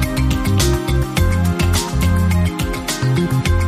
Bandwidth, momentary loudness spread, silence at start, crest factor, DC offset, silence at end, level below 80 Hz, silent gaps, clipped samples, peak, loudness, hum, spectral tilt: 15.5 kHz; 3 LU; 0 s; 14 dB; under 0.1%; 0 s; -22 dBFS; none; under 0.1%; -2 dBFS; -17 LUFS; none; -5.5 dB/octave